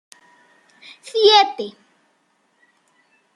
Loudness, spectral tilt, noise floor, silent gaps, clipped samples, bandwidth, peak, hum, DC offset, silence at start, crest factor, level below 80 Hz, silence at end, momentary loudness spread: -15 LUFS; -1.5 dB/octave; -64 dBFS; none; under 0.1%; 11.5 kHz; -2 dBFS; none; under 0.1%; 1.15 s; 20 dB; -80 dBFS; 1.65 s; 21 LU